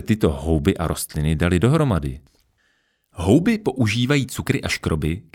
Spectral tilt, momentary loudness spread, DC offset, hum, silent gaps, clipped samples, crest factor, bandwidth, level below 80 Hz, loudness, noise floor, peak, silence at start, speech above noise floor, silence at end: -6 dB/octave; 7 LU; under 0.1%; none; none; under 0.1%; 18 dB; 17.5 kHz; -34 dBFS; -20 LUFS; -66 dBFS; -2 dBFS; 0 s; 46 dB; 0.15 s